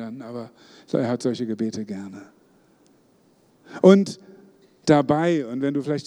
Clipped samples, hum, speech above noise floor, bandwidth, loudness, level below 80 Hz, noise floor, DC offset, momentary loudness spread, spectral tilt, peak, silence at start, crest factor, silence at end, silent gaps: under 0.1%; none; 37 dB; 11 kHz; -21 LUFS; -68 dBFS; -59 dBFS; under 0.1%; 24 LU; -7 dB/octave; 0 dBFS; 0 s; 22 dB; 0.05 s; none